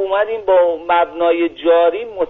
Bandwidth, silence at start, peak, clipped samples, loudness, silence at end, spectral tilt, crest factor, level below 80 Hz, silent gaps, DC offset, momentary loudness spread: 4 kHz; 0 s; -2 dBFS; under 0.1%; -15 LUFS; 0 s; -1 dB/octave; 12 dB; -54 dBFS; none; under 0.1%; 4 LU